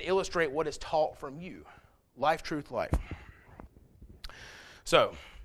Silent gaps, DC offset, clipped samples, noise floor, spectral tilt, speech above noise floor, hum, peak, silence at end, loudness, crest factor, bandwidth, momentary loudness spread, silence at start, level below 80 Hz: none; under 0.1%; under 0.1%; -55 dBFS; -4.5 dB/octave; 24 dB; none; -8 dBFS; 0 s; -31 LUFS; 26 dB; 15 kHz; 22 LU; 0 s; -46 dBFS